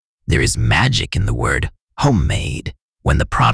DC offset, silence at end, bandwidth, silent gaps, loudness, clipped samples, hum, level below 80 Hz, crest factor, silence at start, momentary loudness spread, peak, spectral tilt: under 0.1%; 0 s; 11 kHz; 1.83-1.88 s, 2.82-2.93 s; -17 LUFS; under 0.1%; none; -26 dBFS; 16 dB; 0.3 s; 10 LU; -2 dBFS; -5 dB/octave